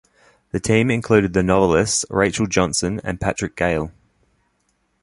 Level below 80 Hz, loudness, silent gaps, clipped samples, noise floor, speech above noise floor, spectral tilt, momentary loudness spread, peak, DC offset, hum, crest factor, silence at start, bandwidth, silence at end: -40 dBFS; -19 LUFS; none; under 0.1%; -67 dBFS; 48 dB; -4.5 dB/octave; 8 LU; -2 dBFS; under 0.1%; none; 18 dB; 0.55 s; 11.5 kHz; 1.15 s